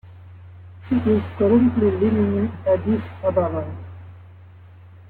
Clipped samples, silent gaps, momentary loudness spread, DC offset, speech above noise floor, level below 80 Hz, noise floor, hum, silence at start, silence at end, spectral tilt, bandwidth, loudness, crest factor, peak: under 0.1%; none; 19 LU; under 0.1%; 25 dB; -52 dBFS; -44 dBFS; none; 0.05 s; 0.05 s; -11.5 dB/octave; 4.3 kHz; -20 LUFS; 16 dB; -6 dBFS